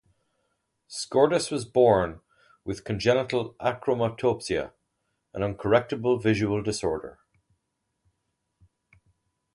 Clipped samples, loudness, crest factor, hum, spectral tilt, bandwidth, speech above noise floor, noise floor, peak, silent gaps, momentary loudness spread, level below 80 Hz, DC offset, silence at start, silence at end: under 0.1%; -26 LUFS; 20 dB; none; -5.5 dB/octave; 11.5 kHz; 54 dB; -79 dBFS; -6 dBFS; none; 14 LU; -54 dBFS; under 0.1%; 0.9 s; 2.45 s